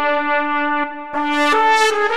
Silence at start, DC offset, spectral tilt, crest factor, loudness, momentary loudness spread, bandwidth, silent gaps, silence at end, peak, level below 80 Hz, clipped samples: 0 s; 2%; -1.5 dB/octave; 12 dB; -17 LUFS; 9 LU; 15 kHz; none; 0 s; -4 dBFS; -58 dBFS; under 0.1%